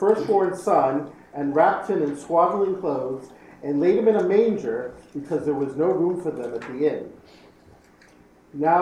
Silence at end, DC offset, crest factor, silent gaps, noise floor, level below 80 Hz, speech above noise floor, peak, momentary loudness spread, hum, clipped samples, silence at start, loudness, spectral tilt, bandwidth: 0 s; under 0.1%; 18 dB; none; -53 dBFS; -62 dBFS; 31 dB; -6 dBFS; 14 LU; none; under 0.1%; 0 s; -23 LUFS; -7.5 dB/octave; 11.5 kHz